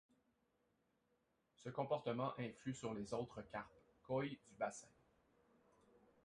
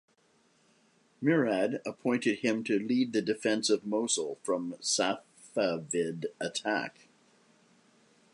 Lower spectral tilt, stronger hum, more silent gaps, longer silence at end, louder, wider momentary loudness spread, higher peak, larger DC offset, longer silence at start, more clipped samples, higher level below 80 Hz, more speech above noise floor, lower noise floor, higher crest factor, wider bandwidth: first, -6 dB/octave vs -3.5 dB/octave; neither; neither; about the same, 1.35 s vs 1.45 s; second, -47 LUFS vs -31 LUFS; first, 9 LU vs 6 LU; second, -28 dBFS vs -14 dBFS; neither; first, 1.6 s vs 1.2 s; neither; about the same, -78 dBFS vs -80 dBFS; about the same, 38 dB vs 38 dB; first, -83 dBFS vs -68 dBFS; about the same, 20 dB vs 18 dB; about the same, 11 kHz vs 11.5 kHz